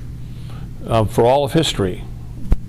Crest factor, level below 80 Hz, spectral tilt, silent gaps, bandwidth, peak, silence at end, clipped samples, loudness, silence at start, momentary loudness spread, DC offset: 18 dB; -28 dBFS; -6 dB/octave; none; 15.5 kHz; 0 dBFS; 0 s; under 0.1%; -17 LUFS; 0 s; 18 LU; under 0.1%